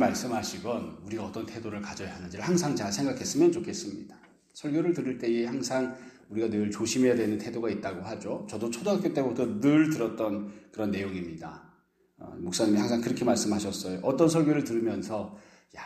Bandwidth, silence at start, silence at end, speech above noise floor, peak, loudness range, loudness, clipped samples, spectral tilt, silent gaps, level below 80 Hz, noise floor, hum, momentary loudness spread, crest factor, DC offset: 14.5 kHz; 0 s; 0 s; 36 dB; -8 dBFS; 4 LU; -29 LUFS; under 0.1%; -5 dB/octave; none; -64 dBFS; -65 dBFS; none; 13 LU; 20 dB; under 0.1%